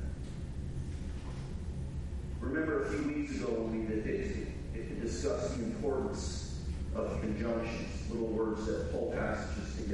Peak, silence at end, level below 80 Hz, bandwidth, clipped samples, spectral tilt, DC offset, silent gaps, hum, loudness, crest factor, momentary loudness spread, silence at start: -20 dBFS; 0 s; -44 dBFS; 11.5 kHz; under 0.1%; -6.5 dB/octave; under 0.1%; none; none; -37 LUFS; 14 dB; 8 LU; 0 s